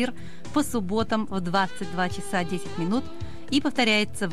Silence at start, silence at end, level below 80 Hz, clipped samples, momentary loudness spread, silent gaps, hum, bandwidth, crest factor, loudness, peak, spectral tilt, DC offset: 0 s; 0 s; -50 dBFS; under 0.1%; 9 LU; none; none; 14 kHz; 18 dB; -26 LUFS; -10 dBFS; -4.5 dB/octave; 2%